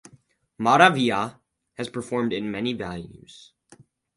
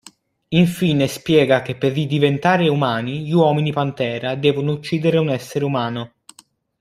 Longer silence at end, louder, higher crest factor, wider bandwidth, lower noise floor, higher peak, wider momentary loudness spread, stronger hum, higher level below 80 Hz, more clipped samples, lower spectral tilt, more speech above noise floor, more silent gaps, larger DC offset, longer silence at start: first, 1.05 s vs 0.75 s; second, -23 LUFS vs -18 LUFS; first, 24 dB vs 16 dB; second, 11.5 kHz vs 15.5 kHz; first, -58 dBFS vs -53 dBFS; about the same, 0 dBFS vs -2 dBFS; first, 18 LU vs 6 LU; neither; about the same, -60 dBFS vs -56 dBFS; neither; second, -5 dB/octave vs -6.5 dB/octave; about the same, 35 dB vs 35 dB; neither; neither; about the same, 0.6 s vs 0.5 s